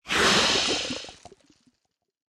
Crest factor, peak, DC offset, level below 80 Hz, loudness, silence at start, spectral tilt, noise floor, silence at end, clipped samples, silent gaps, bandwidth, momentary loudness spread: 18 dB; -8 dBFS; under 0.1%; -52 dBFS; -22 LUFS; 0.05 s; -1.5 dB/octave; -78 dBFS; 1.15 s; under 0.1%; none; 15.5 kHz; 17 LU